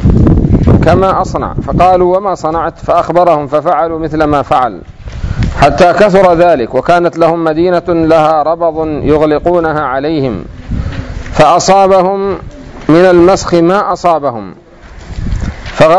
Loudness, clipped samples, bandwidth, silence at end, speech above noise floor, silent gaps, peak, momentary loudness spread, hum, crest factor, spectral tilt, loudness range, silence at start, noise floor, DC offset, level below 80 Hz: -9 LUFS; 4%; 11 kHz; 0 s; 23 dB; none; 0 dBFS; 14 LU; none; 10 dB; -6.5 dB/octave; 3 LU; 0 s; -31 dBFS; under 0.1%; -22 dBFS